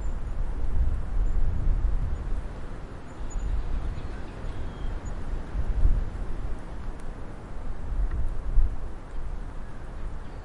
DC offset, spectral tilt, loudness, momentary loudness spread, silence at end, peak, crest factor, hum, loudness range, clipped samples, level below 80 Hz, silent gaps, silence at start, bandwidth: under 0.1%; -7.5 dB/octave; -34 LUFS; 11 LU; 0 s; -8 dBFS; 18 dB; none; 3 LU; under 0.1%; -28 dBFS; none; 0 s; 7.4 kHz